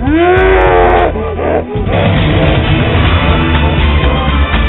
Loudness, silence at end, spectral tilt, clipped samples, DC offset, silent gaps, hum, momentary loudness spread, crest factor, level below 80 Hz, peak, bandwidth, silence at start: -10 LUFS; 0 s; -10 dB/octave; under 0.1%; under 0.1%; none; none; 6 LU; 10 dB; -16 dBFS; 0 dBFS; 4.2 kHz; 0 s